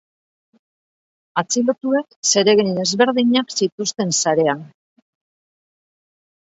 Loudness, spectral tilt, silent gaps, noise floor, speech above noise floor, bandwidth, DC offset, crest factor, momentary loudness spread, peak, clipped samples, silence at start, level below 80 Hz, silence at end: -18 LUFS; -3 dB/octave; 2.16-2.23 s, 3.72-3.78 s; under -90 dBFS; over 72 dB; 8 kHz; under 0.1%; 20 dB; 7 LU; 0 dBFS; under 0.1%; 1.35 s; -70 dBFS; 1.85 s